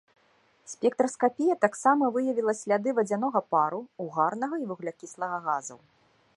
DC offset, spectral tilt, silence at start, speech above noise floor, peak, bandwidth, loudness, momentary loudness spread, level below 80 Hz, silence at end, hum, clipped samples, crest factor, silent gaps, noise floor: under 0.1%; -5.5 dB/octave; 0.65 s; 38 dB; -6 dBFS; 11.5 kHz; -27 LUFS; 12 LU; -80 dBFS; 0.6 s; none; under 0.1%; 22 dB; none; -65 dBFS